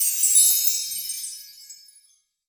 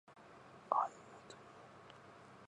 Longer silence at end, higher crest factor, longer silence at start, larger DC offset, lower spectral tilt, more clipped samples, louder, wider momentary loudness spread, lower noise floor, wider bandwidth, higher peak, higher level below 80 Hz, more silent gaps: first, 0.75 s vs 0 s; second, 20 dB vs 30 dB; about the same, 0 s vs 0.1 s; neither; second, 7 dB/octave vs -4.5 dB/octave; neither; first, -17 LUFS vs -39 LUFS; about the same, 19 LU vs 21 LU; about the same, -61 dBFS vs -59 dBFS; first, over 20 kHz vs 10.5 kHz; first, -4 dBFS vs -16 dBFS; first, -78 dBFS vs -84 dBFS; neither